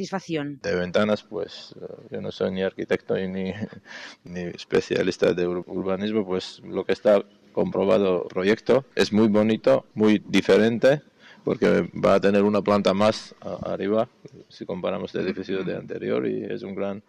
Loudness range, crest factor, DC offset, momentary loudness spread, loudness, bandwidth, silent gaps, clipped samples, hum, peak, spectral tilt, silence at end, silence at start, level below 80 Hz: 7 LU; 14 dB; under 0.1%; 14 LU; -24 LUFS; 11 kHz; none; under 0.1%; none; -10 dBFS; -6.5 dB/octave; 0.1 s; 0 s; -62 dBFS